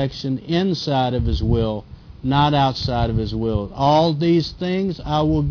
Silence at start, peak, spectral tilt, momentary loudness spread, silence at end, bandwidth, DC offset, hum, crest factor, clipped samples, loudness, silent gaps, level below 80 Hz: 0 s; -4 dBFS; -7.5 dB/octave; 7 LU; 0 s; 5.4 kHz; under 0.1%; none; 14 dB; under 0.1%; -20 LUFS; none; -32 dBFS